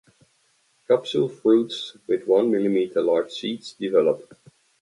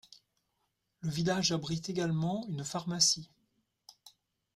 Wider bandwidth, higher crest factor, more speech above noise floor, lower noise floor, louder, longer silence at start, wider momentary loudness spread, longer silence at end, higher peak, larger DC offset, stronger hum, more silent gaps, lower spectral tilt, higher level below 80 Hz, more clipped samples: second, 11.5 kHz vs 14.5 kHz; about the same, 18 dB vs 22 dB; second, 43 dB vs 48 dB; second, -65 dBFS vs -81 dBFS; first, -23 LUFS vs -32 LUFS; first, 0.9 s vs 0.1 s; about the same, 10 LU vs 10 LU; first, 0.6 s vs 0.45 s; first, -6 dBFS vs -12 dBFS; neither; neither; neither; first, -6 dB/octave vs -3.5 dB/octave; about the same, -72 dBFS vs -68 dBFS; neither